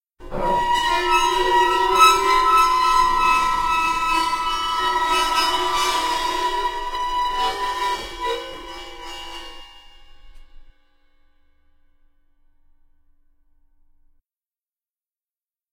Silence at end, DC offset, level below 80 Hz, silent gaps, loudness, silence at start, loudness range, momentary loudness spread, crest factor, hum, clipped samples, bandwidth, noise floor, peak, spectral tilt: 5.1 s; under 0.1%; -40 dBFS; none; -19 LUFS; 0.2 s; 17 LU; 18 LU; 22 dB; none; under 0.1%; 16.5 kHz; under -90 dBFS; 0 dBFS; -1.5 dB/octave